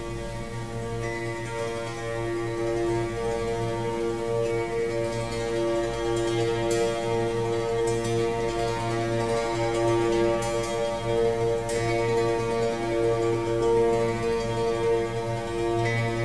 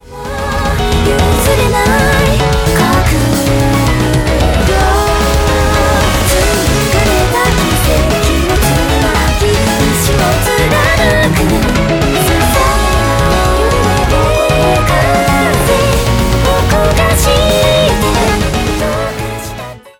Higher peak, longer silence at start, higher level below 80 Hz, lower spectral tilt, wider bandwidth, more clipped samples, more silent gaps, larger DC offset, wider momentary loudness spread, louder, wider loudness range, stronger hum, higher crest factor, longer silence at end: second, -12 dBFS vs -2 dBFS; about the same, 0 s vs 0.1 s; second, -44 dBFS vs -16 dBFS; about the same, -5.5 dB/octave vs -4.5 dB/octave; second, 11 kHz vs 17.5 kHz; neither; neither; first, 0.6% vs under 0.1%; first, 7 LU vs 3 LU; second, -27 LUFS vs -11 LUFS; first, 4 LU vs 1 LU; neither; first, 14 dB vs 8 dB; about the same, 0 s vs 0.1 s